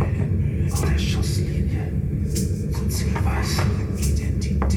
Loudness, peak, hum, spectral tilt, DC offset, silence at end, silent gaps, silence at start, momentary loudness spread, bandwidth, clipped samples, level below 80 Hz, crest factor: -23 LUFS; -10 dBFS; none; -6 dB/octave; under 0.1%; 0 s; none; 0 s; 3 LU; 17.5 kHz; under 0.1%; -26 dBFS; 12 dB